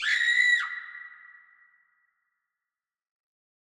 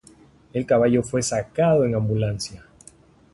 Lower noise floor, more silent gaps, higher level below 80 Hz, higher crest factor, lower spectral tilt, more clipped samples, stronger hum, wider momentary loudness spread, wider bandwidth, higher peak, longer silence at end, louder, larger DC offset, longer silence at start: first, under -90 dBFS vs -52 dBFS; neither; second, -84 dBFS vs -50 dBFS; about the same, 20 dB vs 16 dB; second, 4.5 dB/octave vs -6 dB/octave; neither; neither; first, 23 LU vs 12 LU; first, 13.5 kHz vs 11.5 kHz; second, -12 dBFS vs -8 dBFS; first, 2.55 s vs 0.75 s; about the same, -22 LUFS vs -22 LUFS; neither; second, 0 s vs 0.55 s